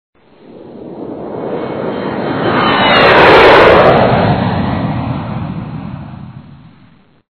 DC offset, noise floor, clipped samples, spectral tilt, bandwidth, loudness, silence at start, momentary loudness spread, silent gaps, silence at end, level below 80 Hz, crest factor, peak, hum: under 0.1%; -46 dBFS; 1%; -7.5 dB/octave; 5.4 kHz; -9 LUFS; 0.5 s; 23 LU; none; 0.75 s; -34 dBFS; 12 dB; 0 dBFS; none